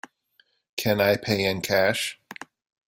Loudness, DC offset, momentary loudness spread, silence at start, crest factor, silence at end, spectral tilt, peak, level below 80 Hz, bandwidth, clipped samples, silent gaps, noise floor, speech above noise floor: -24 LUFS; under 0.1%; 19 LU; 0.75 s; 20 dB; 0.55 s; -4 dB/octave; -8 dBFS; -60 dBFS; 16.5 kHz; under 0.1%; none; -65 dBFS; 42 dB